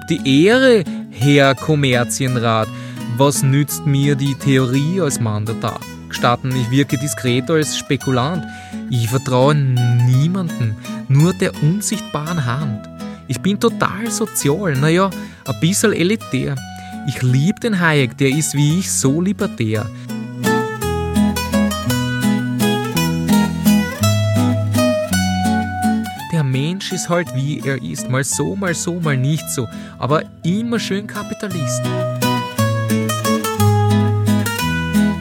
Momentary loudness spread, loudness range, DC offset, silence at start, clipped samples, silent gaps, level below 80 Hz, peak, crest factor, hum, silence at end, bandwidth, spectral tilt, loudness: 9 LU; 3 LU; under 0.1%; 0 s; under 0.1%; none; -48 dBFS; 0 dBFS; 16 dB; none; 0 s; 17 kHz; -5.5 dB/octave; -17 LUFS